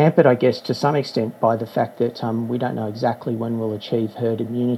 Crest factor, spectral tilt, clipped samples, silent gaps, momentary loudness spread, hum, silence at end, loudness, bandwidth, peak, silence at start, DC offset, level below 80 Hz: 20 dB; -7.5 dB/octave; under 0.1%; none; 8 LU; none; 0 s; -21 LUFS; 12.5 kHz; 0 dBFS; 0 s; under 0.1%; -70 dBFS